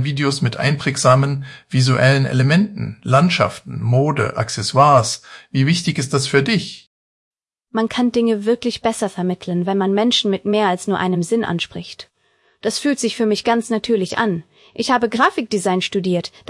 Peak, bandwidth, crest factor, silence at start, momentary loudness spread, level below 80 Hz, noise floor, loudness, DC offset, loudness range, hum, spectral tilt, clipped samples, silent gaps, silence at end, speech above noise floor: -2 dBFS; 12 kHz; 16 dB; 0 s; 10 LU; -56 dBFS; -61 dBFS; -18 LUFS; under 0.1%; 4 LU; none; -5.5 dB/octave; under 0.1%; 6.87-7.31 s; 0.2 s; 43 dB